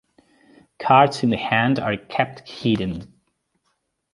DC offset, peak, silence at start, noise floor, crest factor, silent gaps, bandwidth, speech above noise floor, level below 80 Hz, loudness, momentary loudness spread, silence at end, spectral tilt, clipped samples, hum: under 0.1%; -2 dBFS; 0.8 s; -72 dBFS; 22 dB; none; 11.5 kHz; 52 dB; -52 dBFS; -20 LUFS; 13 LU; 1.1 s; -6.5 dB/octave; under 0.1%; none